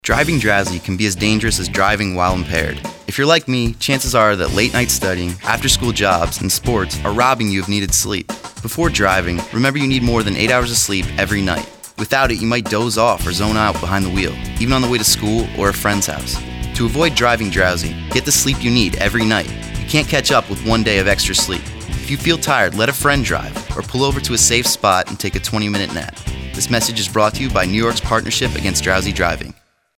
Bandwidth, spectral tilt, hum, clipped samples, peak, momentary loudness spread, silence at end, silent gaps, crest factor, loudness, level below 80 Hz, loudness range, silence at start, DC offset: over 20 kHz; -3.5 dB/octave; none; under 0.1%; 0 dBFS; 9 LU; 0.45 s; none; 16 dB; -16 LUFS; -30 dBFS; 2 LU; 0.05 s; under 0.1%